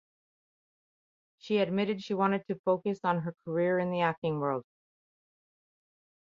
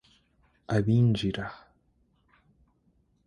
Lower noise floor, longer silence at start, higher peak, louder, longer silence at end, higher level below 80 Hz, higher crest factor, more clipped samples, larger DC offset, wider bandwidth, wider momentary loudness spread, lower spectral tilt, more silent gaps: first, under -90 dBFS vs -69 dBFS; first, 1.45 s vs 0.7 s; about the same, -12 dBFS vs -12 dBFS; second, -31 LUFS vs -27 LUFS; about the same, 1.6 s vs 1.7 s; second, -76 dBFS vs -54 dBFS; about the same, 20 dB vs 18 dB; neither; neither; second, 7.4 kHz vs 10.5 kHz; second, 5 LU vs 13 LU; about the same, -7.5 dB/octave vs -8 dB/octave; first, 2.59-2.64 s, 4.18-4.22 s vs none